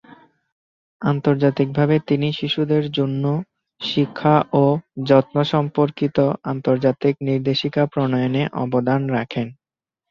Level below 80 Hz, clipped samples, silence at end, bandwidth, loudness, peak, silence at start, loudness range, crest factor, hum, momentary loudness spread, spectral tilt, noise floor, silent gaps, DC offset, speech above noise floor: -58 dBFS; under 0.1%; 0.6 s; 6.8 kHz; -20 LUFS; -2 dBFS; 0.1 s; 2 LU; 18 dB; none; 7 LU; -8.5 dB/octave; under -90 dBFS; 0.52-1.00 s; under 0.1%; over 71 dB